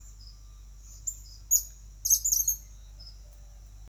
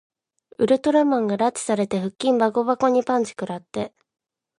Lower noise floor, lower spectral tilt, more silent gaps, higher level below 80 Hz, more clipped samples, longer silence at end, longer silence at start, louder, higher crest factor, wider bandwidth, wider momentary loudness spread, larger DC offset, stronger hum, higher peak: about the same, -48 dBFS vs -45 dBFS; second, 1 dB/octave vs -5.5 dB/octave; neither; first, -48 dBFS vs -64 dBFS; neither; second, 0 s vs 0.7 s; second, 0 s vs 0.6 s; second, -26 LUFS vs -22 LUFS; first, 24 dB vs 16 dB; first, over 20 kHz vs 11.5 kHz; first, 26 LU vs 12 LU; neither; neither; about the same, -8 dBFS vs -6 dBFS